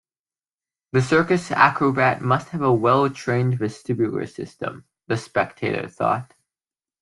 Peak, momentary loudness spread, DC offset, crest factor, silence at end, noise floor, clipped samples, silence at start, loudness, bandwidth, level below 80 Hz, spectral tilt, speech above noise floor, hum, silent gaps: -2 dBFS; 12 LU; under 0.1%; 20 dB; 0.8 s; under -90 dBFS; under 0.1%; 0.95 s; -21 LUFS; 11.5 kHz; -60 dBFS; -6.5 dB/octave; over 69 dB; none; none